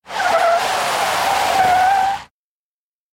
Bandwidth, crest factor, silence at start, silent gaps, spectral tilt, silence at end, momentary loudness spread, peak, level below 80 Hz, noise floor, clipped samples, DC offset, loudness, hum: 16.5 kHz; 14 dB; 0.1 s; none; -1.5 dB/octave; 0.85 s; 4 LU; -4 dBFS; -52 dBFS; under -90 dBFS; under 0.1%; under 0.1%; -16 LUFS; none